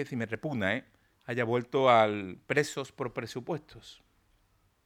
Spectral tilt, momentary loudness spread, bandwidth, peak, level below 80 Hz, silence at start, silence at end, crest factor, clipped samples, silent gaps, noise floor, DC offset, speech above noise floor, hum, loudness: -5.5 dB/octave; 15 LU; 16 kHz; -8 dBFS; -70 dBFS; 0 s; 0.9 s; 22 dB; under 0.1%; none; -70 dBFS; under 0.1%; 39 dB; none; -30 LUFS